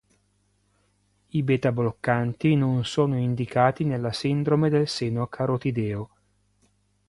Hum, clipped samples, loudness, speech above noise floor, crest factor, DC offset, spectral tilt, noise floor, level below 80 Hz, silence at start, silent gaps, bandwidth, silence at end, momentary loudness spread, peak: 50 Hz at -55 dBFS; under 0.1%; -25 LUFS; 44 dB; 20 dB; under 0.1%; -7 dB/octave; -68 dBFS; -56 dBFS; 1.35 s; none; 11.5 kHz; 1.05 s; 7 LU; -4 dBFS